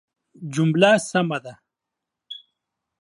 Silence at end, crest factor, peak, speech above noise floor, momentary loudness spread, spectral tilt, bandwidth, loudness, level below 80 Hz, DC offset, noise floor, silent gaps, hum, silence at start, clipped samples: 0.65 s; 22 dB; -2 dBFS; 64 dB; 22 LU; -5.5 dB/octave; 11.5 kHz; -20 LUFS; -70 dBFS; under 0.1%; -84 dBFS; none; none; 0.4 s; under 0.1%